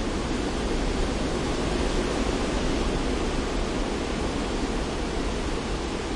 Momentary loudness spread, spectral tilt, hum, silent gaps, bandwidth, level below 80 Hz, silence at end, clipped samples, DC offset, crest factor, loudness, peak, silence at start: 3 LU; -5 dB/octave; none; none; 11.5 kHz; -32 dBFS; 0 s; under 0.1%; under 0.1%; 12 dB; -28 LUFS; -14 dBFS; 0 s